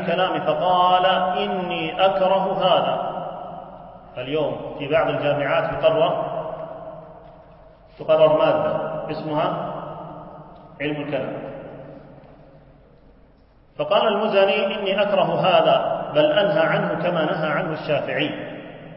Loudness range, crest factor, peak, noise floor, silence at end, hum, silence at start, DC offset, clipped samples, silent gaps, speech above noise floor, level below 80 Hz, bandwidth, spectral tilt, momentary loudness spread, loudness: 10 LU; 18 dB; -4 dBFS; -53 dBFS; 0 s; none; 0 s; under 0.1%; under 0.1%; none; 33 dB; -54 dBFS; 5.6 kHz; -10 dB/octave; 19 LU; -21 LUFS